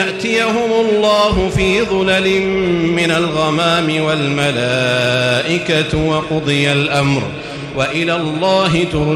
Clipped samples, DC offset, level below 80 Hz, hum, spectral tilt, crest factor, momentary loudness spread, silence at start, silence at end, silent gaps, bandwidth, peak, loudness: under 0.1%; under 0.1%; -36 dBFS; none; -5 dB/octave; 12 dB; 3 LU; 0 s; 0 s; none; 13.5 kHz; -4 dBFS; -14 LUFS